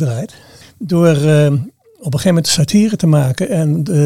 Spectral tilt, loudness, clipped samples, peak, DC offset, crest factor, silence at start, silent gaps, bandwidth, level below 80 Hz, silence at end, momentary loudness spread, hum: -6 dB/octave; -13 LUFS; under 0.1%; 0 dBFS; under 0.1%; 14 dB; 0 s; none; 15 kHz; -48 dBFS; 0 s; 15 LU; none